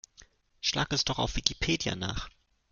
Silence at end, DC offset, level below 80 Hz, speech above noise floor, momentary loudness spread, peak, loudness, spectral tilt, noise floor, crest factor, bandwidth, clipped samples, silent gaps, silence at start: 0.45 s; under 0.1%; -44 dBFS; 29 dB; 8 LU; -2 dBFS; -30 LUFS; -3 dB/octave; -59 dBFS; 32 dB; 11 kHz; under 0.1%; none; 0.2 s